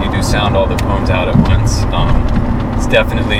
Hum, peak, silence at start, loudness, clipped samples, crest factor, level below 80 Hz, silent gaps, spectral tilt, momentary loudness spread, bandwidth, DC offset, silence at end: none; 0 dBFS; 0 s; -14 LUFS; under 0.1%; 12 dB; -16 dBFS; none; -6 dB/octave; 4 LU; 15.5 kHz; under 0.1%; 0 s